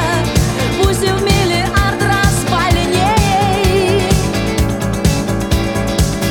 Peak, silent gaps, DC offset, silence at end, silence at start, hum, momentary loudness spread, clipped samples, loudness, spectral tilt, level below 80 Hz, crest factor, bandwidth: 0 dBFS; none; 0.6%; 0 s; 0 s; none; 4 LU; under 0.1%; -14 LUFS; -5 dB/octave; -22 dBFS; 14 dB; 19 kHz